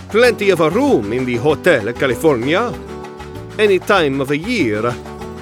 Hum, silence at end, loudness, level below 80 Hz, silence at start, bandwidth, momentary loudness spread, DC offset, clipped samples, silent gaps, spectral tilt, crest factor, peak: none; 0 s; -15 LUFS; -42 dBFS; 0 s; 16.5 kHz; 16 LU; under 0.1%; under 0.1%; none; -5.5 dB/octave; 14 dB; -2 dBFS